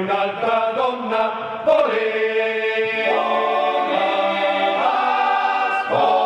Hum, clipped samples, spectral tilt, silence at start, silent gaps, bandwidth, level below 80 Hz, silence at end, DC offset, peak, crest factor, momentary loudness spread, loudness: none; under 0.1%; -5 dB/octave; 0 s; none; 9.4 kHz; -66 dBFS; 0 s; under 0.1%; -6 dBFS; 14 dB; 4 LU; -19 LUFS